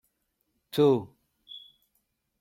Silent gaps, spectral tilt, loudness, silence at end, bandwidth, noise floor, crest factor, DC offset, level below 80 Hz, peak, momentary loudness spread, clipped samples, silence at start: none; -7.5 dB/octave; -26 LUFS; 0.8 s; 16.5 kHz; -77 dBFS; 20 dB; under 0.1%; -74 dBFS; -12 dBFS; 23 LU; under 0.1%; 0.75 s